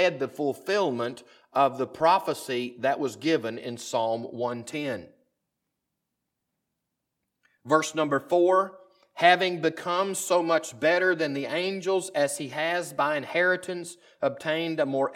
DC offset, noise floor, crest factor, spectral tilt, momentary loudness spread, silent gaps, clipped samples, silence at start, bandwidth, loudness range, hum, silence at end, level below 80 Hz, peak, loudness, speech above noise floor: under 0.1%; -83 dBFS; 22 dB; -4 dB/octave; 10 LU; none; under 0.1%; 0 s; 16.5 kHz; 10 LU; none; 0 s; -76 dBFS; -6 dBFS; -26 LUFS; 56 dB